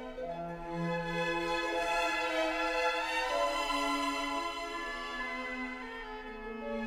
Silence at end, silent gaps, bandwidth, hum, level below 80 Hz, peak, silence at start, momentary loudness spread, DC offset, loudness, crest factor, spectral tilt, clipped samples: 0 s; none; 16 kHz; none; -54 dBFS; -20 dBFS; 0 s; 10 LU; under 0.1%; -34 LUFS; 16 dB; -3.5 dB/octave; under 0.1%